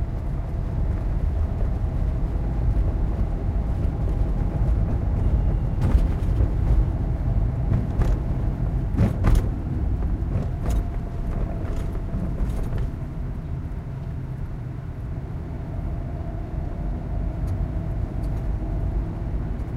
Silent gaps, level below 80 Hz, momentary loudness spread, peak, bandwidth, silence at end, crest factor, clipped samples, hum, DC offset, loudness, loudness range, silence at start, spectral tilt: none; -26 dBFS; 9 LU; -6 dBFS; 7.4 kHz; 0 s; 18 dB; under 0.1%; none; under 0.1%; -27 LUFS; 8 LU; 0 s; -9 dB/octave